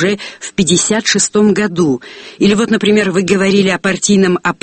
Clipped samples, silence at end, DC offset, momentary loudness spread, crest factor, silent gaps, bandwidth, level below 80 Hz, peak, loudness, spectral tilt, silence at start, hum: under 0.1%; 0.1 s; under 0.1%; 5 LU; 12 dB; none; 8.8 kHz; -48 dBFS; 0 dBFS; -12 LUFS; -4 dB/octave; 0 s; none